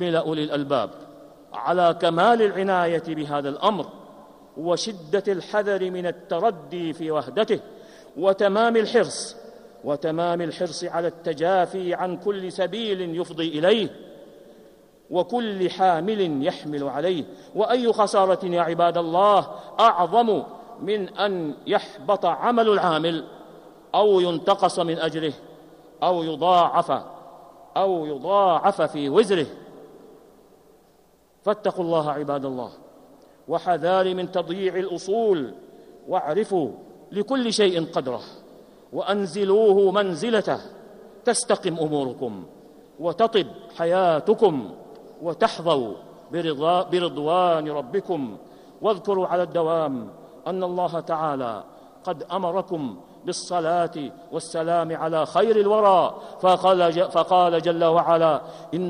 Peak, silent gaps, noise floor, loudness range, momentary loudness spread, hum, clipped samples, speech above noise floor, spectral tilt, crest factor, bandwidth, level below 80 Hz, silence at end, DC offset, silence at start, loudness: -6 dBFS; none; -58 dBFS; 6 LU; 13 LU; none; under 0.1%; 36 dB; -5 dB/octave; 18 dB; 11.5 kHz; -68 dBFS; 0 s; under 0.1%; 0 s; -23 LUFS